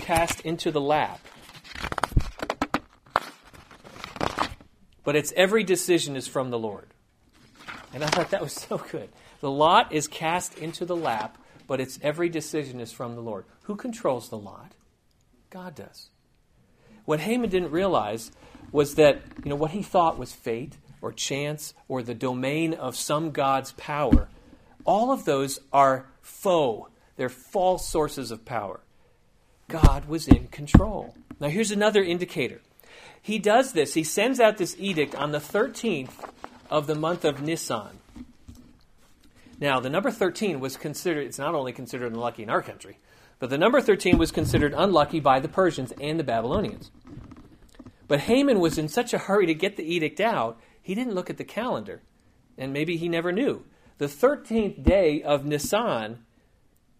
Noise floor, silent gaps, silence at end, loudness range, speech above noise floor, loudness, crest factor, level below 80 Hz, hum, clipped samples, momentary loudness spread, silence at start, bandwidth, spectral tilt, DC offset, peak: -64 dBFS; none; 0.85 s; 7 LU; 39 dB; -25 LUFS; 26 dB; -38 dBFS; none; under 0.1%; 18 LU; 0 s; 15.5 kHz; -5 dB/octave; under 0.1%; 0 dBFS